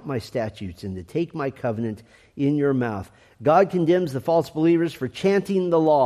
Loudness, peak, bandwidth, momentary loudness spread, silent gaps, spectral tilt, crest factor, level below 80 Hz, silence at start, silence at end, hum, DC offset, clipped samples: -23 LUFS; -6 dBFS; 14 kHz; 12 LU; none; -7.5 dB/octave; 16 dB; -60 dBFS; 0.05 s; 0 s; none; under 0.1%; under 0.1%